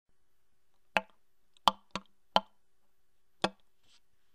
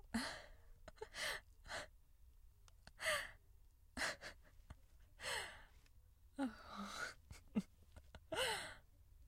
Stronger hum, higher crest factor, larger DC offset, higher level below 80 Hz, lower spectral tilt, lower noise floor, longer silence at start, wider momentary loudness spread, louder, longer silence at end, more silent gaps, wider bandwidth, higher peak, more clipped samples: neither; first, 32 dB vs 22 dB; neither; about the same, -64 dBFS vs -66 dBFS; about the same, -3 dB/octave vs -2.5 dB/octave; first, -80 dBFS vs -67 dBFS; first, 0.95 s vs 0.05 s; second, 13 LU vs 23 LU; first, -34 LUFS vs -46 LUFS; first, 0.85 s vs 0 s; neither; about the same, 15.5 kHz vs 16 kHz; first, -6 dBFS vs -28 dBFS; neither